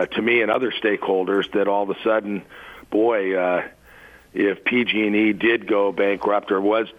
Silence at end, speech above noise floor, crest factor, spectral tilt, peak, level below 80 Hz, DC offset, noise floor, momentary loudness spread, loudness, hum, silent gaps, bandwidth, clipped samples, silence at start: 0.1 s; 27 dB; 14 dB; -6.5 dB/octave; -6 dBFS; -60 dBFS; under 0.1%; -47 dBFS; 7 LU; -20 LUFS; none; none; 8 kHz; under 0.1%; 0 s